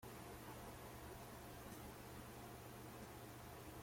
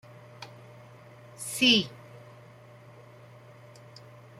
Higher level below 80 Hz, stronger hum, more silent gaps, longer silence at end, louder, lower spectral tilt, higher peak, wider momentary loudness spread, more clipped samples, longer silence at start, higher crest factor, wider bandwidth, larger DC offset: first, -66 dBFS vs -74 dBFS; neither; neither; second, 0 s vs 2.2 s; second, -55 LUFS vs -24 LUFS; first, -4.5 dB/octave vs -2.5 dB/octave; second, -42 dBFS vs -10 dBFS; second, 1 LU vs 30 LU; neither; second, 0 s vs 0.4 s; second, 14 dB vs 24 dB; about the same, 16.5 kHz vs 16 kHz; neither